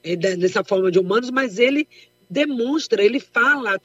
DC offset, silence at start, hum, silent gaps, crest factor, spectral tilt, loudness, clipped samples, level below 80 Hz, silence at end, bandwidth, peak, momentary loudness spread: under 0.1%; 0.05 s; none; none; 16 dB; -5 dB/octave; -19 LUFS; under 0.1%; -72 dBFS; 0.05 s; 8 kHz; -4 dBFS; 5 LU